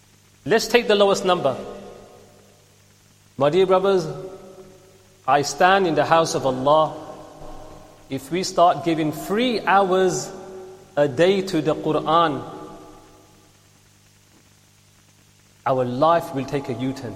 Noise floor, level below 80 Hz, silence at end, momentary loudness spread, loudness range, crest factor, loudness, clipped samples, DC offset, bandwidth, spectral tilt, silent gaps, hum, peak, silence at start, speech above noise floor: -55 dBFS; -54 dBFS; 0 s; 21 LU; 6 LU; 22 dB; -20 LUFS; under 0.1%; under 0.1%; 15.5 kHz; -4.5 dB/octave; none; 50 Hz at -55 dBFS; 0 dBFS; 0.45 s; 35 dB